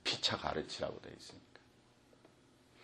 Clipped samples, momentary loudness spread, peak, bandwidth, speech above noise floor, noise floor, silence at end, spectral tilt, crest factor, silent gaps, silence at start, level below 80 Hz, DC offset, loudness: under 0.1%; 20 LU; -18 dBFS; 12 kHz; 24 dB; -67 dBFS; 0 s; -3 dB/octave; 24 dB; none; 0.05 s; -66 dBFS; under 0.1%; -38 LUFS